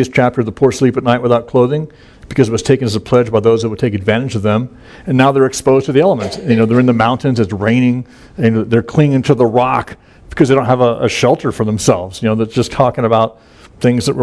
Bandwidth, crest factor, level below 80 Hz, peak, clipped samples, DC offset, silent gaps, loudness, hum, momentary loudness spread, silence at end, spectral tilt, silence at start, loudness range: 11 kHz; 12 dB; -42 dBFS; 0 dBFS; 0.1%; under 0.1%; none; -13 LUFS; none; 6 LU; 0 s; -6.5 dB/octave; 0 s; 2 LU